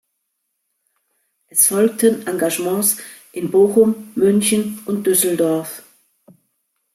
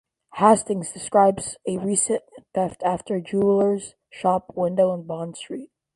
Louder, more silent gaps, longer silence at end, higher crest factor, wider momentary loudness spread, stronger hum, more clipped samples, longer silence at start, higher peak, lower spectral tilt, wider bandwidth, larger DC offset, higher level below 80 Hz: first, -17 LUFS vs -22 LUFS; neither; first, 1.15 s vs 0.3 s; about the same, 18 dB vs 20 dB; second, 11 LU vs 14 LU; neither; neither; first, 1.55 s vs 0.35 s; about the same, -2 dBFS vs -2 dBFS; about the same, -4 dB/octave vs -5 dB/octave; first, 16 kHz vs 11.5 kHz; neither; about the same, -64 dBFS vs -60 dBFS